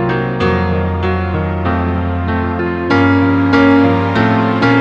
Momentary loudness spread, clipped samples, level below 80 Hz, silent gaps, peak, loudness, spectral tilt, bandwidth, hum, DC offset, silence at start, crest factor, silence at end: 7 LU; under 0.1%; -36 dBFS; none; 0 dBFS; -14 LUFS; -8.5 dB/octave; 6.8 kHz; none; under 0.1%; 0 s; 12 dB; 0 s